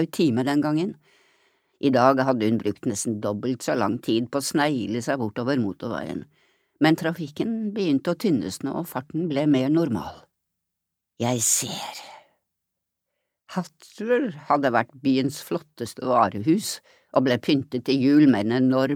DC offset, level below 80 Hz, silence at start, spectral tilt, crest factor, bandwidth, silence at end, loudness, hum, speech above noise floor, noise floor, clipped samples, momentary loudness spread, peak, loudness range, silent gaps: under 0.1%; -66 dBFS; 0 s; -5 dB/octave; 22 dB; 17 kHz; 0 s; -24 LUFS; none; 60 dB; -83 dBFS; under 0.1%; 12 LU; -2 dBFS; 5 LU; none